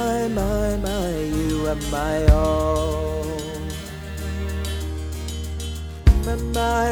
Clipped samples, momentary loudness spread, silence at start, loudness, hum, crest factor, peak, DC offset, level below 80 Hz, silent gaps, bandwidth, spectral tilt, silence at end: under 0.1%; 11 LU; 0 s; -23 LUFS; none; 22 dB; 0 dBFS; under 0.1%; -26 dBFS; none; 19.5 kHz; -6 dB/octave; 0 s